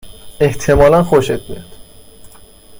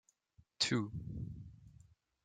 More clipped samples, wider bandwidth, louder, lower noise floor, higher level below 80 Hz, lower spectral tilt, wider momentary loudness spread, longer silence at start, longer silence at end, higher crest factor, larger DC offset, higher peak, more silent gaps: neither; first, 16.5 kHz vs 9.6 kHz; first, -13 LUFS vs -38 LUFS; second, -40 dBFS vs -71 dBFS; first, -30 dBFS vs -62 dBFS; first, -6 dB/octave vs -4 dB/octave; about the same, 19 LU vs 18 LU; second, 0.05 s vs 0.6 s; second, 0 s vs 0.55 s; second, 14 dB vs 22 dB; neither; first, 0 dBFS vs -20 dBFS; neither